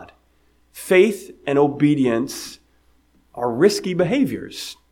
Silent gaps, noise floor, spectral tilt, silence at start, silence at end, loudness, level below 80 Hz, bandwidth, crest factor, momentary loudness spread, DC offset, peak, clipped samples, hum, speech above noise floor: none; -59 dBFS; -5.5 dB/octave; 0 s; 0.2 s; -19 LUFS; -58 dBFS; 17 kHz; 18 dB; 16 LU; under 0.1%; -2 dBFS; under 0.1%; none; 40 dB